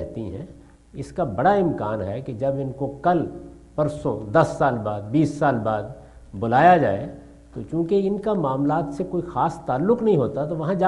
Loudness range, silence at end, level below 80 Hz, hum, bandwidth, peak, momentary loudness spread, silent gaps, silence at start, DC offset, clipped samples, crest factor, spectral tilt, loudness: 4 LU; 0 s; -48 dBFS; none; 11.5 kHz; -2 dBFS; 15 LU; none; 0 s; under 0.1%; under 0.1%; 20 dB; -8 dB/octave; -22 LUFS